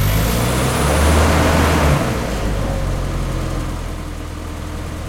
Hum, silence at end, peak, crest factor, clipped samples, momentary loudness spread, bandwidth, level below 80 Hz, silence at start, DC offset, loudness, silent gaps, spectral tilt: none; 0 s; -2 dBFS; 16 dB; under 0.1%; 14 LU; 16.5 kHz; -22 dBFS; 0 s; under 0.1%; -18 LUFS; none; -5 dB/octave